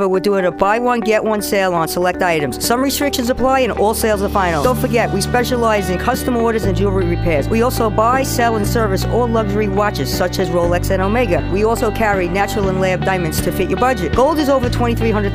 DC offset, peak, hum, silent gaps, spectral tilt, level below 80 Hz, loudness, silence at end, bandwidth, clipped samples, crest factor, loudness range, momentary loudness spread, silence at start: under 0.1%; 0 dBFS; none; none; -5.5 dB/octave; -28 dBFS; -16 LUFS; 0 s; 16 kHz; under 0.1%; 16 dB; 1 LU; 2 LU; 0 s